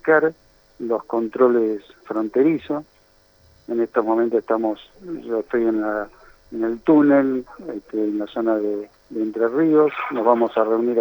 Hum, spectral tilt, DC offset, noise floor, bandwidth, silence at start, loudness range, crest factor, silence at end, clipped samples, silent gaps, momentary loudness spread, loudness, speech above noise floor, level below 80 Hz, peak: none; -8.5 dB/octave; under 0.1%; -56 dBFS; over 20 kHz; 0.05 s; 3 LU; 18 dB; 0 s; under 0.1%; none; 14 LU; -21 LUFS; 36 dB; -58 dBFS; -2 dBFS